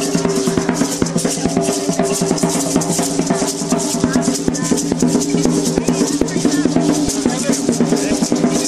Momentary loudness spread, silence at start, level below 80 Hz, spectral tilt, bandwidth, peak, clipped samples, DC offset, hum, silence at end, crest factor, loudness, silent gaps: 2 LU; 0 s; -42 dBFS; -4.5 dB/octave; 15 kHz; 0 dBFS; under 0.1%; under 0.1%; none; 0 s; 16 dB; -16 LUFS; none